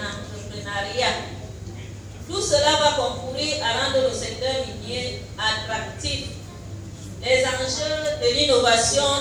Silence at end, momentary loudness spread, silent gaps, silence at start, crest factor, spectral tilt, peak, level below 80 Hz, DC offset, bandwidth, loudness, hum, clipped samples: 0 s; 19 LU; none; 0 s; 20 dB; -2.5 dB/octave; -4 dBFS; -44 dBFS; under 0.1%; 19.5 kHz; -22 LUFS; none; under 0.1%